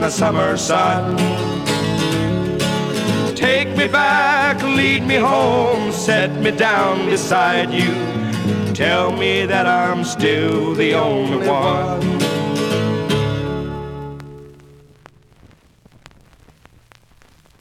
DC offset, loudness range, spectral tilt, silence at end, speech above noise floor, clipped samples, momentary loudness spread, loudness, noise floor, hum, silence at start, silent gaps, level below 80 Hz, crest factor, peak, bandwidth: under 0.1%; 8 LU; -5 dB/octave; 3.05 s; 34 dB; under 0.1%; 6 LU; -17 LUFS; -50 dBFS; none; 0 s; none; -46 dBFS; 16 dB; -2 dBFS; 16.5 kHz